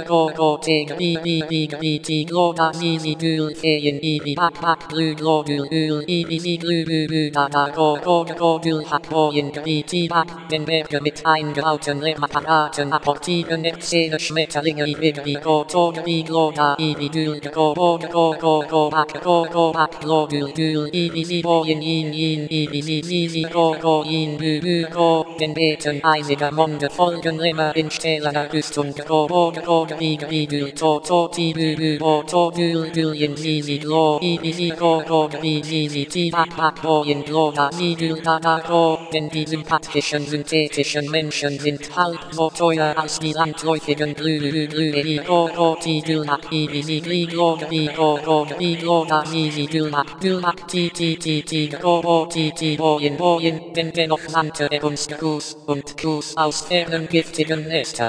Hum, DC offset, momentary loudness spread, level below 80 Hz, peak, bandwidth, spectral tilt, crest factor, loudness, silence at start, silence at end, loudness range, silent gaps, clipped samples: none; under 0.1%; 5 LU; -58 dBFS; -2 dBFS; 10.5 kHz; -5 dB/octave; 18 dB; -20 LUFS; 0 s; 0 s; 2 LU; none; under 0.1%